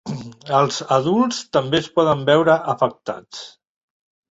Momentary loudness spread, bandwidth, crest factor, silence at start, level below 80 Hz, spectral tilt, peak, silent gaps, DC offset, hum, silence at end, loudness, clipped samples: 16 LU; 8 kHz; 18 dB; 0.05 s; -58 dBFS; -5 dB/octave; -2 dBFS; none; under 0.1%; none; 0.8 s; -18 LUFS; under 0.1%